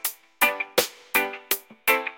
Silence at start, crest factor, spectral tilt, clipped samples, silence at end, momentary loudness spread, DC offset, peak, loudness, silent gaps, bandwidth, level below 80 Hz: 0.05 s; 24 dB; -0.5 dB/octave; under 0.1%; 0 s; 5 LU; under 0.1%; -2 dBFS; -24 LUFS; none; 17 kHz; -70 dBFS